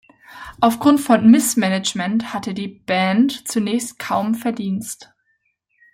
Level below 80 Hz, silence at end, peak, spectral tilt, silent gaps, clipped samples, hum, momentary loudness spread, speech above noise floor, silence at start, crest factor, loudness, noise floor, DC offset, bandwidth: -58 dBFS; 0.9 s; -2 dBFS; -4.5 dB/octave; none; under 0.1%; none; 14 LU; 50 dB; 0.3 s; 18 dB; -18 LUFS; -68 dBFS; under 0.1%; 16.5 kHz